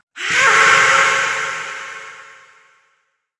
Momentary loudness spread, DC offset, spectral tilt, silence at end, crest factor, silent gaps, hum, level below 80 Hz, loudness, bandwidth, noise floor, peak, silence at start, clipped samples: 21 LU; under 0.1%; 0 dB/octave; 1.15 s; 18 dB; none; none; -66 dBFS; -13 LUFS; 11.5 kHz; -66 dBFS; 0 dBFS; 0.15 s; under 0.1%